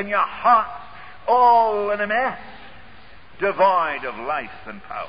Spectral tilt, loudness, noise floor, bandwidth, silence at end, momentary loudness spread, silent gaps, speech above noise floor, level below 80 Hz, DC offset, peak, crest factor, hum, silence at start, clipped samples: -8.5 dB/octave; -20 LUFS; -47 dBFS; 5.2 kHz; 0 s; 22 LU; none; 27 dB; -54 dBFS; 0.9%; -6 dBFS; 16 dB; none; 0 s; under 0.1%